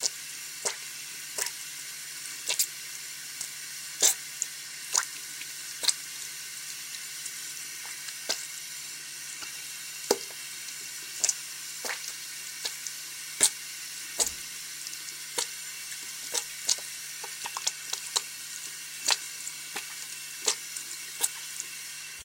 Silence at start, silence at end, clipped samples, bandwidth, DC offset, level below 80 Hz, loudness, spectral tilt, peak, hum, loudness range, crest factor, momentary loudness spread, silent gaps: 0 s; 0 s; under 0.1%; 17 kHz; under 0.1%; -74 dBFS; -32 LUFS; 1.5 dB/octave; -6 dBFS; none; 5 LU; 28 dB; 9 LU; none